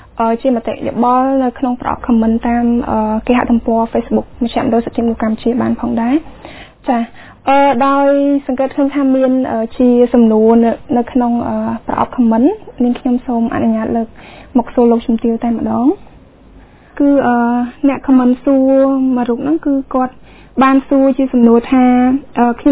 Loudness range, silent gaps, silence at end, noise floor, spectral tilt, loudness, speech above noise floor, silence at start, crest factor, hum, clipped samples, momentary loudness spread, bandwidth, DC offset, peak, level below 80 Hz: 3 LU; none; 0 s; -40 dBFS; -11 dB/octave; -13 LUFS; 28 dB; 0.15 s; 12 dB; none; under 0.1%; 8 LU; 4 kHz; under 0.1%; 0 dBFS; -40 dBFS